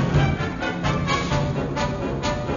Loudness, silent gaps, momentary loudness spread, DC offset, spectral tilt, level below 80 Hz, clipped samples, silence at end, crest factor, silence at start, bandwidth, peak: -24 LUFS; none; 4 LU; under 0.1%; -6 dB/octave; -34 dBFS; under 0.1%; 0 s; 16 dB; 0 s; 7.4 kHz; -8 dBFS